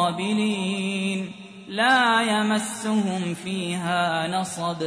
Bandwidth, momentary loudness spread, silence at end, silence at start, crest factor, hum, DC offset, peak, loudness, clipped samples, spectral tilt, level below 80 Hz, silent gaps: 11 kHz; 10 LU; 0 s; 0 s; 16 dB; none; under 0.1%; -8 dBFS; -23 LUFS; under 0.1%; -4 dB/octave; -68 dBFS; none